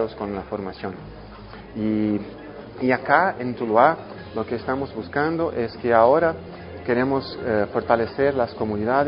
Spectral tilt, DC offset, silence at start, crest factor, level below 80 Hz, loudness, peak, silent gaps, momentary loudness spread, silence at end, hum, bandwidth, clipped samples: -11 dB/octave; under 0.1%; 0 s; 20 dB; -48 dBFS; -22 LUFS; -2 dBFS; none; 19 LU; 0 s; none; 5.4 kHz; under 0.1%